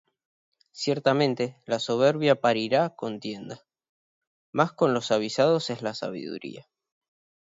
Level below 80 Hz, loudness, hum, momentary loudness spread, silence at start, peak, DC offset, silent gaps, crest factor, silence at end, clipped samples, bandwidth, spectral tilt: -72 dBFS; -25 LUFS; none; 14 LU; 0.75 s; -6 dBFS; under 0.1%; 3.89-4.21 s, 4.27-4.53 s; 20 dB; 0.85 s; under 0.1%; 7.8 kHz; -5.5 dB/octave